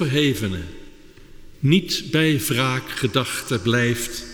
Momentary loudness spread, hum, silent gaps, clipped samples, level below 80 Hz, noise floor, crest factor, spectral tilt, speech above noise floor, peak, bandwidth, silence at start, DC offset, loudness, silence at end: 7 LU; none; none; under 0.1%; -44 dBFS; -43 dBFS; 18 dB; -4.5 dB/octave; 22 dB; -4 dBFS; over 20 kHz; 0 s; under 0.1%; -21 LUFS; 0 s